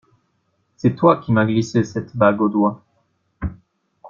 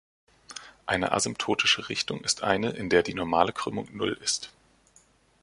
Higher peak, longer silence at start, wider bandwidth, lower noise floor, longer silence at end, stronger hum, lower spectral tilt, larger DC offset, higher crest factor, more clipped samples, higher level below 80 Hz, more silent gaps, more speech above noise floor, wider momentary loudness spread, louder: first, -2 dBFS vs -6 dBFS; first, 0.85 s vs 0.5 s; second, 7.4 kHz vs 11.5 kHz; first, -67 dBFS vs -62 dBFS; second, 0 s vs 0.9 s; neither; first, -7.5 dB/octave vs -2.5 dB/octave; neither; second, 18 dB vs 24 dB; neither; first, -44 dBFS vs -56 dBFS; neither; first, 50 dB vs 34 dB; about the same, 15 LU vs 14 LU; first, -18 LUFS vs -26 LUFS